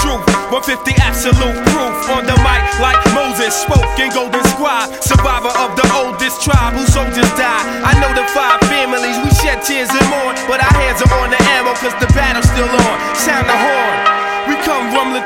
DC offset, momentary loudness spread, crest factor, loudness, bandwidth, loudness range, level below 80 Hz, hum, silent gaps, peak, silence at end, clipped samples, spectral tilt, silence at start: under 0.1%; 4 LU; 12 dB; -12 LUFS; 16.5 kHz; 1 LU; -22 dBFS; none; none; 0 dBFS; 0 s; under 0.1%; -4.5 dB/octave; 0 s